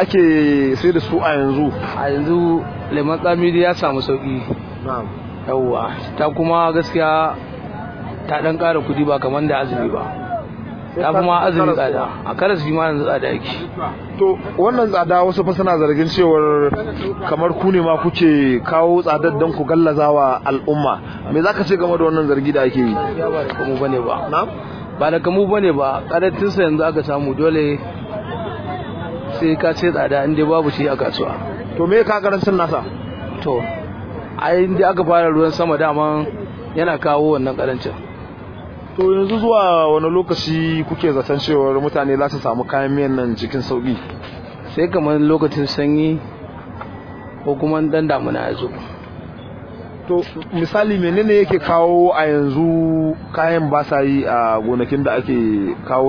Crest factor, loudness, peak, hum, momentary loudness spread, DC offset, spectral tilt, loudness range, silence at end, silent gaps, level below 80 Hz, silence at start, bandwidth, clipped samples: 16 dB; -17 LUFS; -2 dBFS; none; 14 LU; under 0.1%; -8 dB/octave; 4 LU; 0 s; none; -44 dBFS; 0 s; 5.4 kHz; under 0.1%